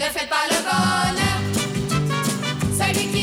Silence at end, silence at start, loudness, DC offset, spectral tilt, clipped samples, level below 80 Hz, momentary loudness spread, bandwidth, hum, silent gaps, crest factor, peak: 0 s; 0 s; -21 LUFS; under 0.1%; -4 dB/octave; under 0.1%; -44 dBFS; 4 LU; over 20 kHz; none; none; 14 dB; -8 dBFS